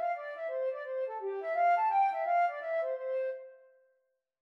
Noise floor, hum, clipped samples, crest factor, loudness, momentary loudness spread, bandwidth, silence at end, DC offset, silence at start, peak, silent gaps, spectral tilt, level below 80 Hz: -78 dBFS; none; under 0.1%; 12 dB; -32 LUFS; 10 LU; 6 kHz; 0.85 s; under 0.1%; 0 s; -20 dBFS; none; -2 dB/octave; under -90 dBFS